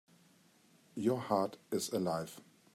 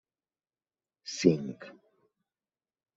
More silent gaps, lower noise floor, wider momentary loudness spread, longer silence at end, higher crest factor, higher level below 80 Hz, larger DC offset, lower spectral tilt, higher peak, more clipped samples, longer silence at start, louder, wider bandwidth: neither; second, -67 dBFS vs under -90 dBFS; second, 15 LU vs 21 LU; second, 0.35 s vs 1.25 s; second, 20 dB vs 28 dB; second, -82 dBFS vs -72 dBFS; neither; about the same, -5.5 dB/octave vs -5.5 dB/octave; second, -18 dBFS vs -8 dBFS; neither; about the same, 0.95 s vs 1.05 s; second, -36 LUFS vs -29 LUFS; first, 16 kHz vs 8 kHz